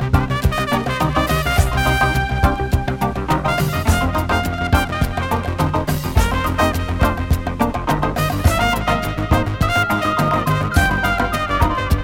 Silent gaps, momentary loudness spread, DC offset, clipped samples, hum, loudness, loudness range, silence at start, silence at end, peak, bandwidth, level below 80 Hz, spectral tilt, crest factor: none; 4 LU; under 0.1%; under 0.1%; none; -18 LUFS; 2 LU; 0 s; 0 s; -2 dBFS; 17.5 kHz; -24 dBFS; -5.5 dB/octave; 16 dB